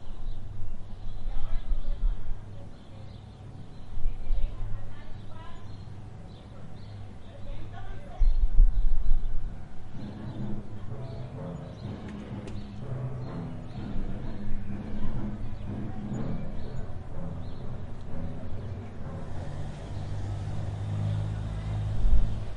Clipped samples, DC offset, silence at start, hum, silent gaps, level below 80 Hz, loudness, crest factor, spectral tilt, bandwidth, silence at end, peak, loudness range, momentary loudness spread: under 0.1%; under 0.1%; 0 s; none; none; -30 dBFS; -37 LUFS; 20 dB; -8 dB/octave; 4.4 kHz; 0 s; -6 dBFS; 8 LU; 14 LU